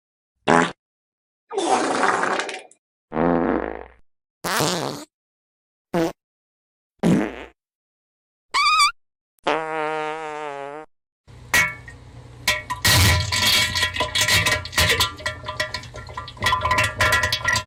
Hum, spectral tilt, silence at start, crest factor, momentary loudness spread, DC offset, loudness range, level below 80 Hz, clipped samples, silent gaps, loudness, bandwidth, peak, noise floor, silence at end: none; -3 dB/octave; 0.45 s; 22 dB; 15 LU; under 0.1%; 9 LU; -44 dBFS; under 0.1%; 0.79-1.47 s, 2.79-3.08 s, 4.30-4.41 s, 5.14-5.85 s, 6.24-6.95 s, 7.75-8.49 s, 9.21-9.43 s, 11.12-11.24 s; -20 LUFS; over 20 kHz; -2 dBFS; -42 dBFS; 0 s